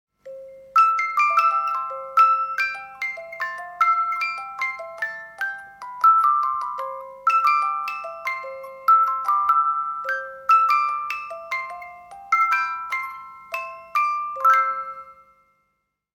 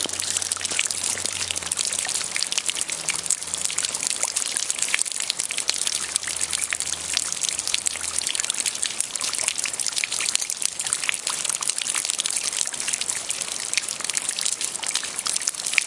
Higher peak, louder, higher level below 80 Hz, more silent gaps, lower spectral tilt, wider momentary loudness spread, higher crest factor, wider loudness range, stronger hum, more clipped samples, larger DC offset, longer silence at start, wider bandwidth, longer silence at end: second, -6 dBFS vs 0 dBFS; about the same, -21 LUFS vs -23 LUFS; second, -70 dBFS vs -64 dBFS; neither; first, 0 dB/octave vs 1.5 dB/octave; first, 16 LU vs 2 LU; second, 16 dB vs 26 dB; first, 4 LU vs 1 LU; first, 50 Hz at -70 dBFS vs none; neither; neither; first, 0.25 s vs 0 s; first, 16.5 kHz vs 12 kHz; first, 1 s vs 0 s